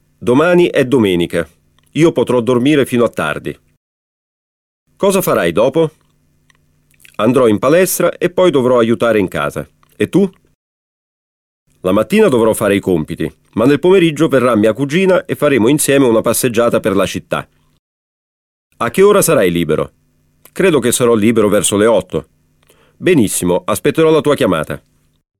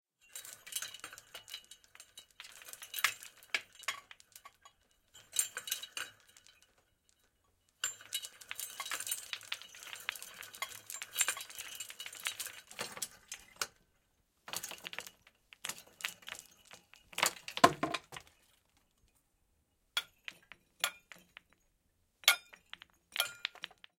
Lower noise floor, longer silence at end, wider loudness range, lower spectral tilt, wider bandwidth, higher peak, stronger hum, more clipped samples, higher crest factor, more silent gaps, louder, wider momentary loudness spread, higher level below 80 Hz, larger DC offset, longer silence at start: second, -55 dBFS vs -77 dBFS; first, 0.65 s vs 0.3 s; second, 4 LU vs 8 LU; first, -5 dB/octave vs -0.5 dB/octave; about the same, 18.5 kHz vs 17 kHz; first, 0 dBFS vs -4 dBFS; neither; neither; second, 14 dB vs 38 dB; first, 3.77-4.86 s, 10.55-11.66 s, 17.79-18.71 s vs none; first, -13 LUFS vs -38 LUFS; second, 10 LU vs 21 LU; first, -46 dBFS vs -78 dBFS; neither; about the same, 0.2 s vs 0.3 s